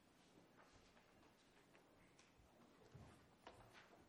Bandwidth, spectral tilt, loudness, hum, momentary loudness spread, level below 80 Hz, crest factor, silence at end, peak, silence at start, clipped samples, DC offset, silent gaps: 19 kHz; -4.5 dB/octave; -67 LUFS; none; 4 LU; -82 dBFS; 24 dB; 0 s; -44 dBFS; 0 s; under 0.1%; under 0.1%; none